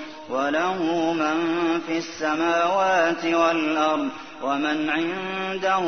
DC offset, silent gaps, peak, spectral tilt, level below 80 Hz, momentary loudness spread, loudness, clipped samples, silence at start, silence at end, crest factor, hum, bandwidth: 0.2%; none; -8 dBFS; -4.5 dB/octave; -64 dBFS; 7 LU; -23 LUFS; under 0.1%; 0 s; 0 s; 16 dB; none; 6.6 kHz